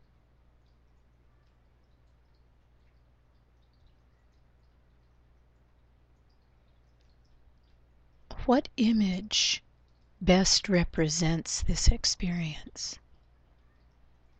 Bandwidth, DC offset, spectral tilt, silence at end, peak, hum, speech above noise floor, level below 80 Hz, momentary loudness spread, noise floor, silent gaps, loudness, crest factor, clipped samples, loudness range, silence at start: 9 kHz; under 0.1%; -4 dB/octave; 1.45 s; -6 dBFS; 60 Hz at -60 dBFS; 37 dB; -38 dBFS; 14 LU; -64 dBFS; none; -27 LUFS; 26 dB; under 0.1%; 6 LU; 8.3 s